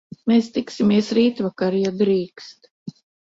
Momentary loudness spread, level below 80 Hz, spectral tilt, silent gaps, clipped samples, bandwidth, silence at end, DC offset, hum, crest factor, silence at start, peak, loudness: 22 LU; -62 dBFS; -6.5 dB/octave; 2.71-2.86 s; under 0.1%; 7.8 kHz; 0.35 s; under 0.1%; none; 14 dB; 0.25 s; -6 dBFS; -20 LUFS